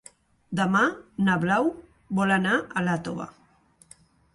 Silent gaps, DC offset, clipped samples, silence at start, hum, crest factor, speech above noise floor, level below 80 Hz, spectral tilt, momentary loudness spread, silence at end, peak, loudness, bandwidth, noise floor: none; under 0.1%; under 0.1%; 0.5 s; none; 18 dB; 35 dB; -60 dBFS; -6 dB/octave; 13 LU; 1.05 s; -8 dBFS; -25 LUFS; 11.5 kHz; -60 dBFS